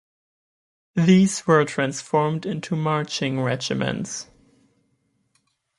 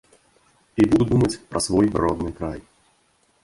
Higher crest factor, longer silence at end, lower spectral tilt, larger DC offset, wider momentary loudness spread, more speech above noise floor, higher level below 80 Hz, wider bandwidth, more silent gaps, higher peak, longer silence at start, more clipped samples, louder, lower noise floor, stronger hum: about the same, 20 dB vs 18 dB; first, 1.55 s vs 0.85 s; about the same, -5.5 dB/octave vs -6 dB/octave; neither; second, 11 LU vs 14 LU; first, 48 dB vs 43 dB; second, -60 dBFS vs -42 dBFS; about the same, 11.5 kHz vs 11.5 kHz; neither; about the same, -4 dBFS vs -4 dBFS; first, 0.95 s vs 0.75 s; neither; about the same, -22 LUFS vs -21 LUFS; first, -69 dBFS vs -63 dBFS; neither